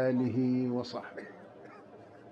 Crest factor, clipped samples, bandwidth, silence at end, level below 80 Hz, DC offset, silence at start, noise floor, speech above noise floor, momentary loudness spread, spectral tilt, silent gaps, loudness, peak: 14 dB; under 0.1%; 7 kHz; 0 s; -74 dBFS; under 0.1%; 0 s; -53 dBFS; 21 dB; 22 LU; -8.5 dB/octave; none; -32 LUFS; -20 dBFS